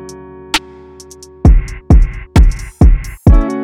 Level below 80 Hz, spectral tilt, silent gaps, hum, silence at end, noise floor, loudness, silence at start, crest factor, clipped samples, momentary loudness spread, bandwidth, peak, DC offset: -12 dBFS; -6.5 dB/octave; none; none; 0 s; -36 dBFS; -13 LUFS; 0 s; 10 dB; under 0.1%; 6 LU; 11.5 kHz; 0 dBFS; under 0.1%